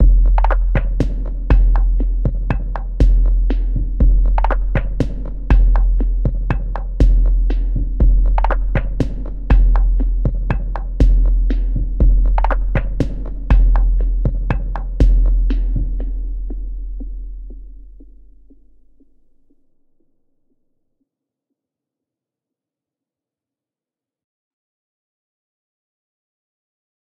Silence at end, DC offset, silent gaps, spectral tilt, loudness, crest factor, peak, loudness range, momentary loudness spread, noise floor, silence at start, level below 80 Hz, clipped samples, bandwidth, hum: 9.2 s; under 0.1%; none; -9 dB/octave; -19 LUFS; 16 dB; 0 dBFS; 8 LU; 11 LU; -90 dBFS; 0 s; -16 dBFS; under 0.1%; 3.3 kHz; none